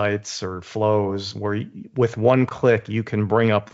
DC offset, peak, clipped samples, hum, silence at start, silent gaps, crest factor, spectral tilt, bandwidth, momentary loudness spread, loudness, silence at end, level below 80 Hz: under 0.1%; -4 dBFS; under 0.1%; none; 0 s; none; 18 dB; -6 dB/octave; 8 kHz; 11 LU; -22 LUFS; 0.1 s; -62 dBFS